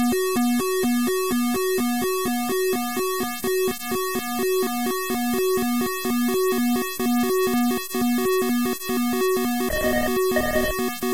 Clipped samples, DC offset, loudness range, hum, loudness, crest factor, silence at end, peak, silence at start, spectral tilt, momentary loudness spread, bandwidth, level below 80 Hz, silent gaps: under 0.1%; 1%; 2 LU; none; -23 LUFS; 12 dB; 0 s; -10 dBFS; 0 s; -3.5 dB/octave; 3 LU; 16 kHz; -46 dBFS; none